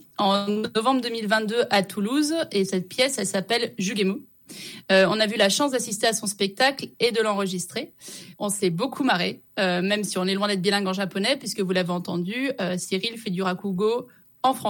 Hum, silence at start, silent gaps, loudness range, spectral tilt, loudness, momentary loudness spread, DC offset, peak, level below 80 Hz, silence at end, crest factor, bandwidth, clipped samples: none; 0.2 s; none; 3 LU; -4 dB/octave; -24 LUFS; 7 LU; under 0.1%; -8 dBFS; -72 dBFS; 0 s; 16 dB; 17 kHz; under 0.1%